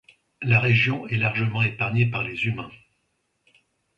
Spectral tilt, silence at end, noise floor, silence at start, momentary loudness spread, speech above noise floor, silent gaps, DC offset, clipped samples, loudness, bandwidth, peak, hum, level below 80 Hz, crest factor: -7.5 dB/octave; 1.25 s; -73 dBFS; 0.4 s; 11 LU; 50 dB; none; under 0.1%; under 0.1%; -23 LUFS; 6.2 kHz; -6 dBFS; none; -56 dBFS; 20 dB